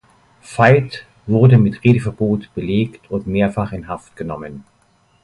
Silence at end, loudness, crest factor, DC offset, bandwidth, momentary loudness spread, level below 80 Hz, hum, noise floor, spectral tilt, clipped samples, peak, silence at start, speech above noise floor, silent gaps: 0.65 s; -16 LUFS; 16 dB; under 0.1%; 11 kHz; 17 LU; -44 dBFS; none; -57 dBFS; -8.5 dB/octave; under 0.1%; 0 dBFS; 0.5 s; 41 dB; none